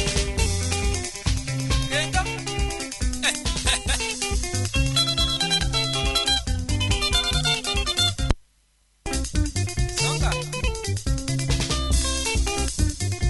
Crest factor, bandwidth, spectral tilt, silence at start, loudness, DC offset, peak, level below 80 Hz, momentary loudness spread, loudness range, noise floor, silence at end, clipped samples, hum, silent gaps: 22 dB; 12 kHz; -3 dB/octave; 0 s; -23 LUFS; under 0.1%; 0 dBFS; -28 dBFS; 7 LU; 4 LU; -63 dBFS; 0 s; under 0.1%; none; none